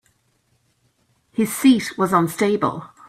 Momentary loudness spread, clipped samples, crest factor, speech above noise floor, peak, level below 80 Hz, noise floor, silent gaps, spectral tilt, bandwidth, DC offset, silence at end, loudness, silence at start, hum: 8 LU; under 0.1%; 18 dB; 47 dB; -4 dBFS; -60 dBFS; -65 dBFS; none; -5 dB/octave; 16 kHz; under 0.1%; 0.2 s; -19 LUFS; 1.4 s; none